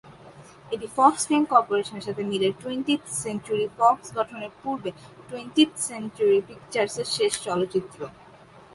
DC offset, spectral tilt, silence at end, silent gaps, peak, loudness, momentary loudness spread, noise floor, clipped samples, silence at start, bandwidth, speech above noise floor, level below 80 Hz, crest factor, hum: under 0.1%; -3.5 dB/octave; 0.65 s; none; -4 dBFS; -25 LUFS; 14 LU; -50 dBFS; under 0.1%; 0.05 s; 11.5 kHz; 25 dB; -64 dBFS; 20 dB; none